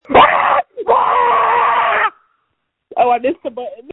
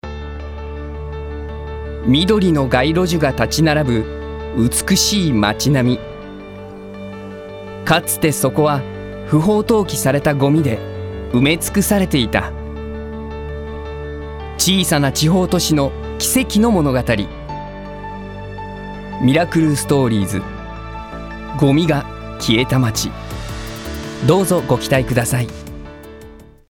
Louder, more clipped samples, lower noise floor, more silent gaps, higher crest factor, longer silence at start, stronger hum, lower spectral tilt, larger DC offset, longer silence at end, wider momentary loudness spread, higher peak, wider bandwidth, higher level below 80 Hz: first, -13 LUFS vs -16 LUFS; neither; first, -70 dBFS vs -39 dBFS; neither; about the same, 14 dB vs 16 dB; about the same, 0.1 s vs 0.05 s; neither; first, -6.5 dB/octave vs -5 dB/octave; neither; second, 0 s vs 0.25 s; about the same, 15 LU vs 16 LU; about the same, 0 dBFS vs -2 dBFS; second, 4.1 kHz vs 17.5 kHz; second, -48 dBFS vs -34 dBFS